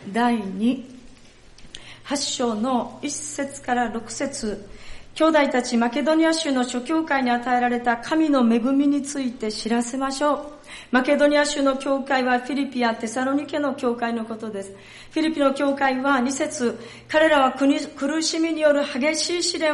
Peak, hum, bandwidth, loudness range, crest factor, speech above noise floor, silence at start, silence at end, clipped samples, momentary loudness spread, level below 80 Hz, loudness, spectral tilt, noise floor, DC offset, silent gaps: -6 dBFS; none; 11.5 kHz; 5 LU; 16 dB; 25 dB; 0 s; 0 s; under 0.1%; 11 LU; -52 dBFS; -22 LUFS; -3 dB/octave; -47 dBFS; under 0.1%; none